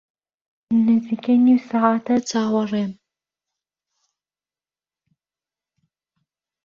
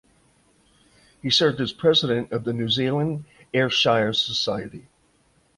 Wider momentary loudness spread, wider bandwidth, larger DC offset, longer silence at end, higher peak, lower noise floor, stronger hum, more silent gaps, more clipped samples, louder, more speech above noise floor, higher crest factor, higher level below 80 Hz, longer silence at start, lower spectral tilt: about the same, 8 LU vs 10 LU; second, 7.4 kHz vs 11.5 kHz; neither; first, 3.7 s vs 0.75 s; about the same, -4 dBFS vs -6 dBFS; first, under -90 dBFS vs -63 dBFS; neither; neither; neither; first, -19 LUFS vs -22 LUFS; first, over 72 dB vs 40 dB; about the same, 18 dB vs 18 dB; second, -66 dBFS vs -58 dBFS; second, 0.7 s vs 1.25 s; first, -6 dB/octave vs -4.5 dB/octave